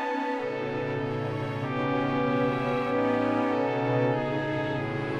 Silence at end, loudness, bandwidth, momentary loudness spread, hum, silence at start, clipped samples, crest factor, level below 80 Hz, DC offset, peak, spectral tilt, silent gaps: 0 s; -28 LUFS; 9.6 kHz; 5 LU; none; 0 s; under 0.1%; 14 dB; -58 dBFS; under 0.1%; -14 dBFS; -8 dB/octave; none